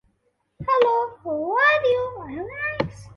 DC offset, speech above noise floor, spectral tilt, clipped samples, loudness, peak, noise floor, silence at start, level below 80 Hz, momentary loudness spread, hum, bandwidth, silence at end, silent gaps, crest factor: under 0.1%; 47 dB; -6 dB/octave; under 0.1%; -22 LUFS; -4 dBFS; -70 dBFS; 0.6 s; -52 dBFS; 14 LU; none; 7 kHz; 0.05 s; none; 18 dB